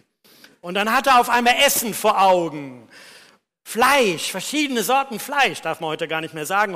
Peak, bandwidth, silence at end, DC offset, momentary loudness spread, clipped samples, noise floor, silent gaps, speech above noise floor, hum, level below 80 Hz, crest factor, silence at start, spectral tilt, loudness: -6 dBFS; 15.5 kHz; 0 s; under 0.1%; 12 LU; under 0.1%; -52 dBFS; none; 33 dB; none; -58 dBFS; 14 dB; 0.65 s; -2 dB/octave; -19 LUFS